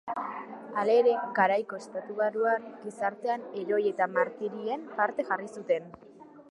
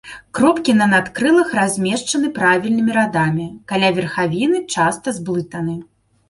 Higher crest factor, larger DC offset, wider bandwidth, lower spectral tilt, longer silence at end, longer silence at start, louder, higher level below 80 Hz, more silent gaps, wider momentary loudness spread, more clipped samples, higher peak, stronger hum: about the same, 20 dB vs 16 dB; neither; about the same, 11 kHz vs 11.5 kHz; about the same, -5.5 dB/octave vs -5 dB/octave; second, 0.1 s vs 0.45 s; about the same, 0.05 s vs 0.05 s; second, -29 LUFS vs -17 LUFS; second, -80 dBFS vs -54 dBFS; neither; about the same, 12 LU vs 10 LU; neither; second, -10 dBFS vs -2 dBFS; neither